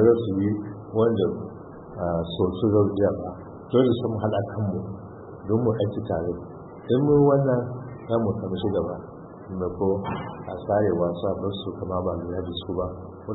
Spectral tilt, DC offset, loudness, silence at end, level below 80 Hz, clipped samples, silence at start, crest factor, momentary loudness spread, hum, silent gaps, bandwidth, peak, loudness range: -12.5 dB/octave; under 0.1%; -25 LUFS; 0 s; -50 dBFS; under 0.1%; 0 s; 18 dB; 16 LU; none; none; 4.1 kHz; -6 dBFS; 3 LU